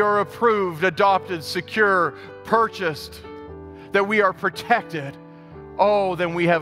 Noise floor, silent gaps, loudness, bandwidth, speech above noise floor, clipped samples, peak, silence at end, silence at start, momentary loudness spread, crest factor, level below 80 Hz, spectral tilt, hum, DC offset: -41 dBFS; none; -21 LUFS; 16 kHz; 20 dB; under 0.1%; -2 dBFS; 0 s; 0 s; 20 LU; 20 dB; -54 dBFS; -5.5 dB/octave; none; under 0.1%